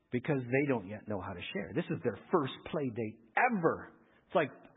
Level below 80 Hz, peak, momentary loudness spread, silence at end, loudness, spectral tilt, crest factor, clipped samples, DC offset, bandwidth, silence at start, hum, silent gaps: -66 dBFS; -14 dBFS; 10 LU; 0.15 s; -34 LUFS; -3 dB/octave; 20 dB; under 0.1%; under 0.1%; 3.9 kHz; 0.1 s; none; none